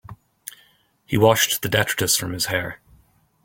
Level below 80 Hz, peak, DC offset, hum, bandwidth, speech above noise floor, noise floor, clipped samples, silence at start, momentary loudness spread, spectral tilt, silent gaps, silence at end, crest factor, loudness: -52 dBFS; -2 dBFS; under 0.1%; none; 17 kHz; 39 dB; -59 dBFS; under 0.1%; 0.1 s; 23 LU; -3 dB/octave; none; 0.7 s; 22 dB; -20 LUFS